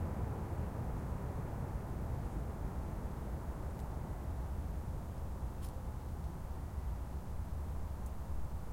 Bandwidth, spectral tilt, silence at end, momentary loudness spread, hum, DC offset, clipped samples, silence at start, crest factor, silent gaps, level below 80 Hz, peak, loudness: 16.5 kHz; -8 dB/octave; 0 s; 3 LU; none; under 0.1%; under 0.1%; 0 s; 14 dB; none; -44 dBFS; -26 dBFS; -43 LUFS